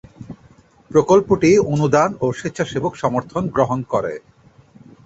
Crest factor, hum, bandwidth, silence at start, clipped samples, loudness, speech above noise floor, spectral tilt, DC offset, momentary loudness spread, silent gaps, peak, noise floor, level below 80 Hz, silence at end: 18 dB; none; 8 kHz; 0.2 s; under 0.1%; -18 LUFS; 33 dB; -6.5 dB/octave; under 0.1%; 16 LU; none; -2 dBFS; -50 dBFS; -50 dBFS; 0.9 s